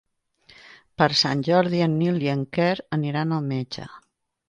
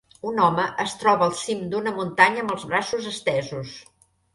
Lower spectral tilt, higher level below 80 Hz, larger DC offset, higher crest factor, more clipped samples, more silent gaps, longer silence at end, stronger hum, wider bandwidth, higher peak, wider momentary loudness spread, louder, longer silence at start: first, -6 dB/octave vs -4 dB/octave; about the same, -62 dBFS vs -62 dBFS; neither; about the same, 20 dB vs 22 dB; neither; neither; about the same, 0.5 s vs 0.55 s; neither; second, 10 kHz vs 11.5 kHz; about the same, -4 dBFS vs -2 dBFS; about the same, 13 LU vs 12 LU; about the same, -23 LUFS vs -23 LUFS; first, 1 s vs 0.25 s